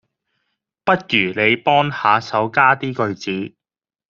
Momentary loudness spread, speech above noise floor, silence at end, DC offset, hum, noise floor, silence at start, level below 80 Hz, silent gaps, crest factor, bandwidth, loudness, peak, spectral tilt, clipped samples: 10 LU; over 73 dB; 0.6 s; under 0.1%; none; under -90 dBFS; 0.85 s; -60 dBFS; none; 18 dB; 7.4 kHz; -17 LUFS; 0 dBFS; -2.5 dB/octave; under 0.1%